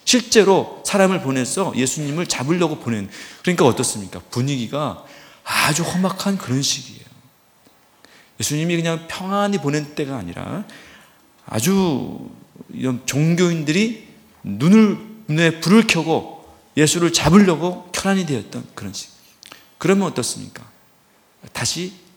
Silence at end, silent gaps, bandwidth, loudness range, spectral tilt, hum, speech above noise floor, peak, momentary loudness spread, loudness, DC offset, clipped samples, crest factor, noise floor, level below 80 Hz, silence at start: 0.2 s; none; 19 kHz; 7 LU; -4.5 dB/octave; none; 37 dB; 0 dBFS; 17 LU; -19 LUFS; under 0.1%; under 0.1%; 20 dB; -56 dBFS; -52 dBFS; 0.05 s